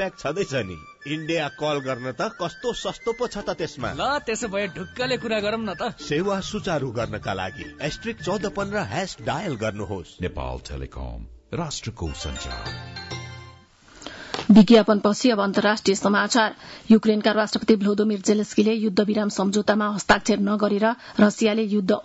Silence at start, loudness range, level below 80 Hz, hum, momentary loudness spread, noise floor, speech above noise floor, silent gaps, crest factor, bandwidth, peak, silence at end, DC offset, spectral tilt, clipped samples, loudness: 0 s; 12 LU; -46 dBFS; none; 14 LU; -50 dBFS; 27 dB; none; 18 dB; 8 kHz; -4 dBFS; 0 s; under 0.1%; -5 dB/octave; under 0.1%; -23 LUFS